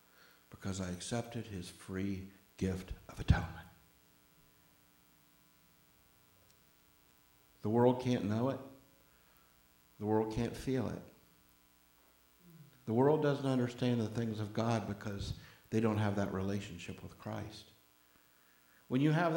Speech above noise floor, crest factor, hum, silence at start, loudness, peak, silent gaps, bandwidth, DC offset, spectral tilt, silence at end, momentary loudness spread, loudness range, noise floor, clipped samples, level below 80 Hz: 33 dB; 24 dB; 60 Hz at -65 dBFS; 0.55 s; -36 LUFS; -14 dBFS; none; 17.5 kHz; under 0.1%; -7 dB/octave; 0 s; 17 LU; 6 LU; -68 dBFS; under 0.1%; -54 dBFS